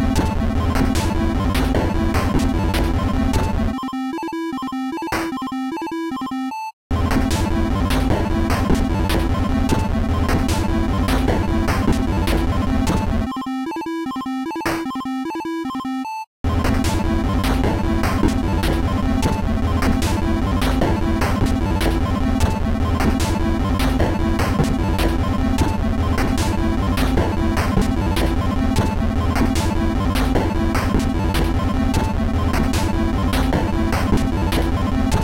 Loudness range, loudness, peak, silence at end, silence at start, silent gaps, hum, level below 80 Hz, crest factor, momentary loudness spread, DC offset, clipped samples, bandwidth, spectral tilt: 3 LU; -20 LUFS; -4 dBFS; 0 s; 0 s; 6.73-6.90 s, 16.27-16.44 s; none; -24 dBFS; 14 dB; 6 LU; under 0.1%; under 0.1%; 16.5 kHz; -6 dB/octave